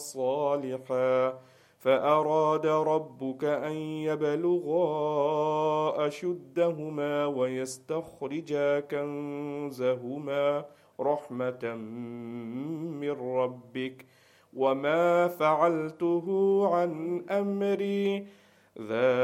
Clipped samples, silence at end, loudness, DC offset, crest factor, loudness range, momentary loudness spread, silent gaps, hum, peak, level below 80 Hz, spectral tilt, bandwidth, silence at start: under 0.1%; 0 s; -29 LUFS; under 0.1%; 18 dB; 6 LU; 12 LU; none; none; -10 dBFS; -78 dBFS; -6.5 dB/octave; 16 kHz; 0 s